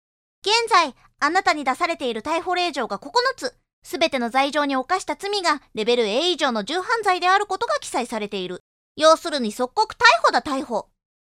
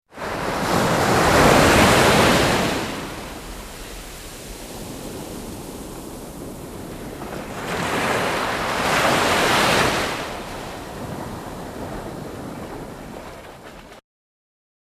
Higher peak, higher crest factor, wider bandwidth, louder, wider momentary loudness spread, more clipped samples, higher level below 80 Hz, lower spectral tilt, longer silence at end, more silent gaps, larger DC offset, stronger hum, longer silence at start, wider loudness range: about the same, -2 dBFS vs -2 dBFS; about the same, 20 dB vs 20 dB; about the same, 15.5 kHz vs 15.5 kHz; second, -21 LUFS vs -18 LUFS; second, 11 LU vs 21 LU; neither; second, -60 dBFS vs -38 dBFS; second, -2 dB/octave vs -4 dB/octave; second, 0.5 s vs 0.9 s; first, 3.73-3.82 s, 8.60-8.95 s vs none; neither; neither; first, 0.45 s vs 0.15 s; second, 3 LU vs 17 LU